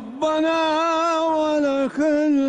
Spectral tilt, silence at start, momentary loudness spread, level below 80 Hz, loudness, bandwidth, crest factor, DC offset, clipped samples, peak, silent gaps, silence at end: -4 dB/octave; 0 s; 2 LU; -60 dBFS; -20 LUFS; 9.4 kHz; 8 dB; under 0.1%; under 0.1%; -12 dBFS; none; 0 s